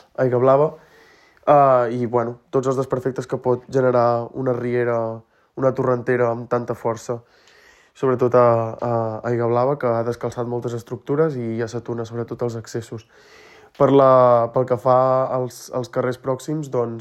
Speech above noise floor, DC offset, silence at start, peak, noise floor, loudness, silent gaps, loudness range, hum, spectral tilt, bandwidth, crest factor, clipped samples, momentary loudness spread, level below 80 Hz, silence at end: 32 dB; under 0.1%; 0.2 s; -4 dBFS; -52 dBFS; -20 LUFS; none; 6 LU; none; -7.5 dB/octave; 13 kHz; 16 dB; under 0.1%; 13 LU; -60 dBFS; 0 s